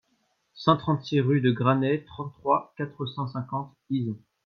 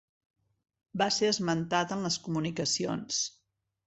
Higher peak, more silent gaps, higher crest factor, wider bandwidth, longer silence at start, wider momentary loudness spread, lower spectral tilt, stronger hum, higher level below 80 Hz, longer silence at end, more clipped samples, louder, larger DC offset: first, -8 dBFS vs -12 dBFS; neither; about the same, 20 dB vs 20 dB; second, 6.6 kHz vs 8.4 kHz; second, 0.55 s vs 0.95 s; first, 11 LU vs 5 LU; first, -8.5 dB/octave vs -3.5 dB/octave; neither; about the same, -64 dBFS vs -68 dBFS; second, 0.3 s vs 0.6 s; neither; first, -27 LUFS vs -30 LUFS; neither